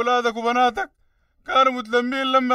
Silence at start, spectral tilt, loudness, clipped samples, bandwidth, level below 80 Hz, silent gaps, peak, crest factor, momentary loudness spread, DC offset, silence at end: 0 s; -3 dB/octave; -20 LUFS; under 0.1%; 13.5 kHz; -58 dBFS; none; -4 dBFS; 16 dB; 12 LU; under 0.1%; 0 s